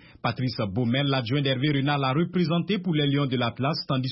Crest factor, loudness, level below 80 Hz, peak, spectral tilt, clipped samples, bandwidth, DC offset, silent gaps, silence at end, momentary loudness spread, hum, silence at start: 14 dB; -25 LUFS; -60 dBFS; -12 dBFS; -10.5 dB/octave; under 0.1%; 5.8 kHz; under 0.1%; none; 0 s; 4 LU; none; 0.25 s